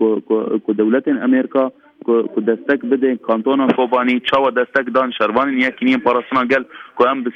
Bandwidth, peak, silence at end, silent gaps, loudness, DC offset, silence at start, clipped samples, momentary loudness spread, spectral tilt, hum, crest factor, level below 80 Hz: 6.2 kHz; -2 dBFS; 0.05 s; none; -17 LUFS; under 0.1%; 0 s; under 0.1%; 4 LU; -7 dB/octave; none; 14 dB; -60 dBFS